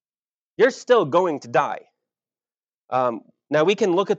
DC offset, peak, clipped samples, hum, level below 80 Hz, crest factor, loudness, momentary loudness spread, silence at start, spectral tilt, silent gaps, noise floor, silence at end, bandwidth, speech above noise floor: under 0.1%; -4 dBFS; under 0.1%; none; -86 dBFS; 18 dB; -21 LUFS; 10 LU; 0.6 s; -5 dB/octave; 2.57-2.61 s, 2.80-2.88 s; under -90 dBFS; 0 s; 8 kHz; over 70 dB